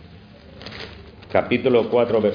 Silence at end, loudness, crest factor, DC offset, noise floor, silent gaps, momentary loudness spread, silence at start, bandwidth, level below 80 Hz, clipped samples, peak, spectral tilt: 0 s; -19 LUFS; 18 dB; under 0.1%; -44 dBFS; none; 20 LU; 0 s; 5.2 kHz; -50 dBFS; under 0.1%; -2 dBFS; -8 dB/octave